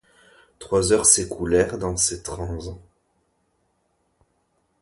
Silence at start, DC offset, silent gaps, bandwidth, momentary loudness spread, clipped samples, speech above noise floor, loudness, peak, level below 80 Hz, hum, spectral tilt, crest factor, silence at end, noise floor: 0.6 s; under 0.1%; none; 12 kHz; 16 LU; under 0.1%; 48 dB; -20 LUFS; 0 dBFS; -44 dBFS; none; -3 dB/octave; 24 dB; 2 s; -69 dBFS